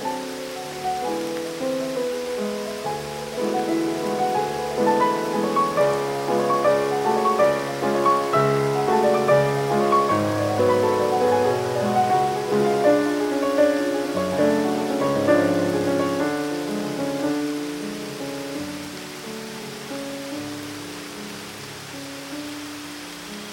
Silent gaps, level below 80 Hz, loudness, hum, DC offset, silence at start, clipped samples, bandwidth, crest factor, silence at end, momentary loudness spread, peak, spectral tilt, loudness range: none; -58 dBFS; -22 LUFS; none; under 0.1%; 0 s; under 0.1%; 17 kHz; 16 dB; 0 s; 14 LU; -6 dBFS; -5 dB/octave; 12 LU